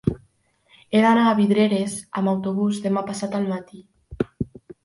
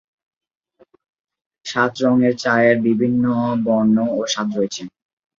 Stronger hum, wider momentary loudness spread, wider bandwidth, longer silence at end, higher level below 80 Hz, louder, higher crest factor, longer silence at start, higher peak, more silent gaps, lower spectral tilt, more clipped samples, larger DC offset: neither; first, 13 LU vs 10 LU; first, 11.5 kHz vs 7.6 kHz; about the same, 0.4 s vs 0.5 s; first, -50 dBFS vs -60 dBFS; second, -22 LUFS vs -18 LUFS; about the same, 18 dB vs 18 dB; second, 0.05 s vs 1.65 s; about the same, -4 dBFS vs -2 dBFS; neither; about the same, -6 dB/octave vs -5.5 dB/octave; neither; neither